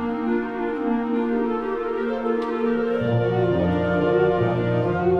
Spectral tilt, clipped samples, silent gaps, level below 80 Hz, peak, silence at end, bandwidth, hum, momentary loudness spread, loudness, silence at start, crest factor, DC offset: -9.5 dB/octave; under 0.1%; none; -48 dBFS; -8 dBFS; 0 s; 6.4 kHz; none; 5 LU; -22 LUFS; 0 s; 14 dB; under 0.1%